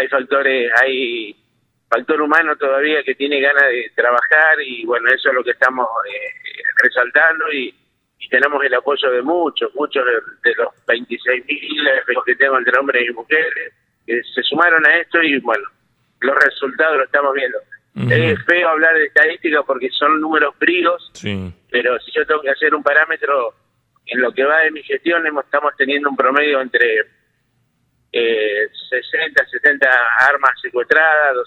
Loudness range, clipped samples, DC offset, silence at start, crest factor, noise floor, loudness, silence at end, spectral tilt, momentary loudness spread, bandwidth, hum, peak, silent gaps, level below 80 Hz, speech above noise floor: 3 LU; under 0.1%; under 0.1%; 0 s; 16 dB; -64 dBFS; -15 LUFS; 0 s; -5.5 dB/octave; 10 LU; 9.6 kHz; none; 0 dBFS; none; -64 dBFS; 48 dB